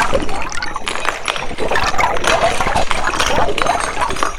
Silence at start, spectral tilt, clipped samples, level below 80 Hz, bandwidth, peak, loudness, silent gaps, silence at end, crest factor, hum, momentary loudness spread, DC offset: 0 s; -2.5 dB/octave; under 0.1%; -26 dBFS; 13.5 kHz; 0 dBFS; -17 LUFS; none; 0 s; 14 dB; none; 7 LU; under 0.1%